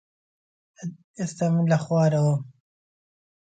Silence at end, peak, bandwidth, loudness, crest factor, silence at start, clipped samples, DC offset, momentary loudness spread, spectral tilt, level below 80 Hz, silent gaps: 1.1 s; -8 dBFS; 9.2 kHz; -23 LUFS; 18 dB; 0.8 s; under 0.1%; under 0.1%; 17 LU; -7.5 dB/octave; -68 dBFS; 1.04-1.14 s